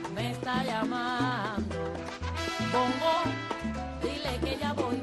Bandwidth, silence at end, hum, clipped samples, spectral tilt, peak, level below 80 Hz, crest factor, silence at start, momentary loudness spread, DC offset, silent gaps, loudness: 12.5 kHz; 0 s; none; under 0.1%; -5.5 dB/octave; -14 dBFS; -46 dBFS; 18 dB; 0 s; 7 LU; under 0.1%; none; -31 LUFS